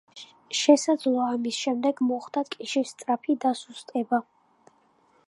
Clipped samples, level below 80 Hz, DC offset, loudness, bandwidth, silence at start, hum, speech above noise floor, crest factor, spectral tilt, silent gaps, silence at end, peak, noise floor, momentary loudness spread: under 0.1%; -84 dBFS; under 0.1%; -26 LUFS; 11.5 kHz; 0.15 s; none; 38 dB; 22 dB; -3 dB/octave; none; 1.05 s; -4 dBFS; -63 dBFS; 11 LU